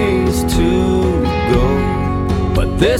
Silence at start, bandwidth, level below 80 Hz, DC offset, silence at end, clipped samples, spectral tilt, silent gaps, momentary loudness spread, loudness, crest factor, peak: 0 s; 16 kHz; -22 dBFS; under 0.1%; 0 s; under 0.1%; -6.5 dB/octave; none; 3 LU; -15 LUFS; 14 dB; 0 dBFS